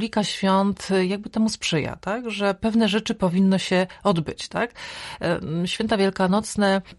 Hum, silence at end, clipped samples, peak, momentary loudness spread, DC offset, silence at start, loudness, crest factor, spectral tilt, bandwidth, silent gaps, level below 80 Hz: none; 0.05 s; under 0.1%; -8 dBFS; 7 LU; under 0.1%; 0 s; -23 LUFS; 16 dB; -5.5 dB/octave; 11.5 kHz; none; -52 dBFS